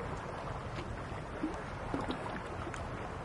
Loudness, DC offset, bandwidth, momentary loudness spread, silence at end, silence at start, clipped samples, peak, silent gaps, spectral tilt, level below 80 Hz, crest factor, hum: -41 LUFS; under 0.1%; 11.5 kHz; 3 LU; 0 s; 0 s; under 0.1%; -20 dBFS; none; -6 dB/octave; -50 dBFS; 20 dB; none